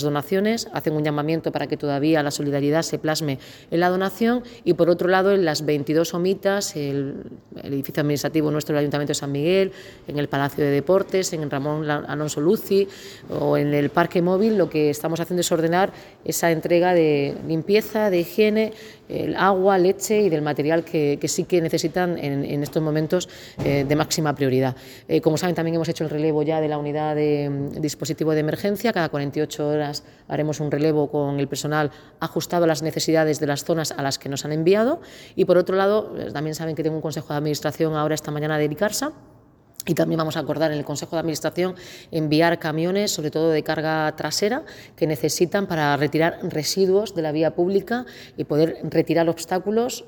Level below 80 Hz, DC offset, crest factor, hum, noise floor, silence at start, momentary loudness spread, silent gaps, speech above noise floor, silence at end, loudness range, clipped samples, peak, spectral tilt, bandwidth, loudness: -56 dBFS; under 0.1%; 20 dB; none; -44 dBFS; 0 s; 8 LU; none; 23 dB; 0 s; 3 LU; under 0.1%; -2 dBFS; -5.5 dB/octave; over 20 kHz; -22 LUFS